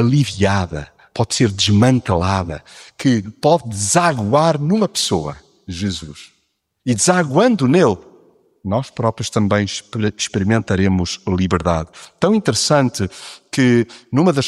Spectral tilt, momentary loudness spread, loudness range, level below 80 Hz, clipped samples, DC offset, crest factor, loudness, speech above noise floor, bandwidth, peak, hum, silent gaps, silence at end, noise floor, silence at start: -5 dB/octave; 13 LU; 2 LU; -44 dBFS; under 0.1%; under 0.1%; 16 dB; -17 LUFS; 50 dB; 13.5 kHz; -2 dBFS; none; none; 0 s; -67 dBFS; 0 s